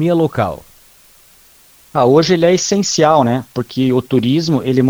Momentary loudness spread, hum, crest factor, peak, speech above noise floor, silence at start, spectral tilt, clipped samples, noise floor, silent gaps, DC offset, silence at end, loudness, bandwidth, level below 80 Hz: 9 LU; none; 14 dB; 0 dBFS; 34 dB; 0 s; -5.5 dB/octave; under 0.1%; -47 dBFS; none; under 0.1%; 0 s; -14 LUFS; over 20 kHz; -50 dBFS